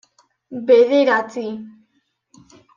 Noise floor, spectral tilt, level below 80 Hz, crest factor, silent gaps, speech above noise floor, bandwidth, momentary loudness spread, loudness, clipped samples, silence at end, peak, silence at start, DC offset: -67 dBFS; -5 dB/octave; -70 dBFS; 16 dB; none; 51 dB; 7.2 kHz; 20 LU; -16 LUFS; under 0.1%; 1.05 s; -2 dBFS; 0.5 s; under 0.1%